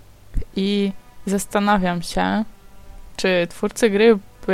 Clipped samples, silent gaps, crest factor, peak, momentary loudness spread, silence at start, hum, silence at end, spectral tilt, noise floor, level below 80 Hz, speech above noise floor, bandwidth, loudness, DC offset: under 0.1%; none; 18 dB; -2 dBFS; 16 LU; 0.15 s; none; 0 s; -5 dB/octave; -39 dBFS; -36 dBFS; 21 dB; 15.5 kHz; -20 LUFS; 0.5%